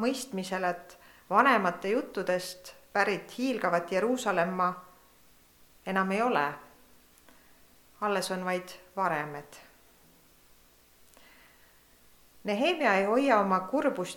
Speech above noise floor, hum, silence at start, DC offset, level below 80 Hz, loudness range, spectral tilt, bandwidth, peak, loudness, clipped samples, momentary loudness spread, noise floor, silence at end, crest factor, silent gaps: 32 dB; none; 0 s; under 0.1%; -70 dBFS; 9 LU; -4.5 dB/octave; 19 kHz; -8 dBFS; -29 LUFS; under 0.1%; 15 LU; -60 dBFS; 0 s; 22 dB; none